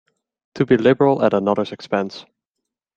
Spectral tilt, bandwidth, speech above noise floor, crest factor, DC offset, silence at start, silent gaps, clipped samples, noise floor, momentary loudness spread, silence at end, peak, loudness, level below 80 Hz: -7.5 dB/octave; 7.4 kHz; 65 dB; 18 dB; under 0.1%; 0.55 s; none; under 0.1%; -82 dBFS; 10 LU; 0.75 s; -2 dBFS; -18 LUFS; -58 dBFS